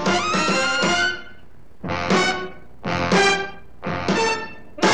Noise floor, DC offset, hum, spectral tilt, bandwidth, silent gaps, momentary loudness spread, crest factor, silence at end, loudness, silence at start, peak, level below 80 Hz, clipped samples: -49 dBFS; 1%; none; -3.5 dB/octave; 12 kHz; none; 16 LU; 18 dB; 0 s; -20 LUFS; 0 s; -4 dBFS; -50 dBFS; under 0.1%